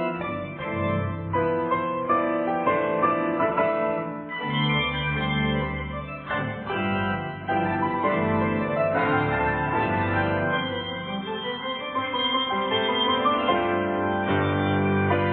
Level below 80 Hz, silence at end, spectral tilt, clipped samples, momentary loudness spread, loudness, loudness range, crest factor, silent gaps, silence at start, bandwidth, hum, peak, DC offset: -48 dBFS; 0 s; -10 dB/octave; under 0.1%; 7 LU; -25 LUFS; 3 LU; 16 dB; none; 0 s; 4.4 kHz; none; -8 dBFS; under 0.1%